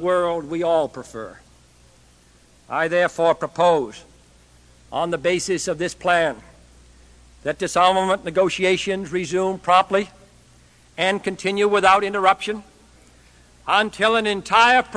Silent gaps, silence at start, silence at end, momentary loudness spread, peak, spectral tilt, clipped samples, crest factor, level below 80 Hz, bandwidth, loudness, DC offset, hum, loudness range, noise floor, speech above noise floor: none; 0 s; 0 s; 14 LU; 0 dBFS; -3.5 dB/octave; under 0.1%; 20 dB; -54 dBFS; 11 kHz; -20 LUFS; under 0.1%; none; 4 LU; -53 dBFS; 34 dB